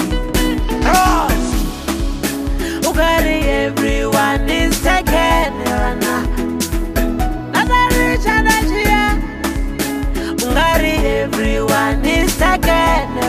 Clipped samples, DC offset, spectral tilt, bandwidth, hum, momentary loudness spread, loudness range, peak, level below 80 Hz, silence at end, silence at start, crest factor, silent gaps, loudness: under 0.1%; under 0.1%; -4.5 dB/octave; 15.5 kHz; none; 7 LU; 2 LU; -2 dBFS; -20 dBFS; 0 s; 0 s; 14 dB; none; -16 LUFS